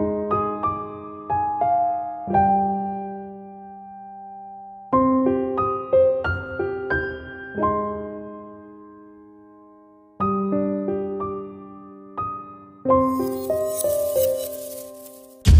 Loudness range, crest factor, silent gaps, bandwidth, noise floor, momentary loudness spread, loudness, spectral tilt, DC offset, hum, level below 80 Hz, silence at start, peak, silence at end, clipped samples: 6 LU; 20 dB; none; 16 kHz; -50 dBFS; 20 LU; -23 LUFS; -6.5 dB/octave; under 0.1%; none; -38 dBFS; 0 s; -4 dBFS; 0 s; under 0.1%